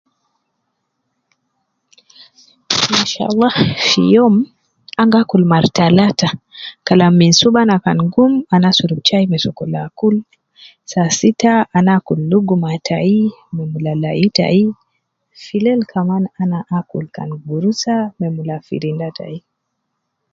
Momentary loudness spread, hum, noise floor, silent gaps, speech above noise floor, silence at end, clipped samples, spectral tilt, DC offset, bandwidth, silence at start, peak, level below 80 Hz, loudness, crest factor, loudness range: 13 LU; none; -73 dBFS; none; 59 dB; 0.95 s; under 0.1%; -5.5 dB/octave; under 0.1%; 7.6 kHz; 2.7 s; 0 dBFS; -54 dBFS; -14 LUFS; 16 dB; 7 LU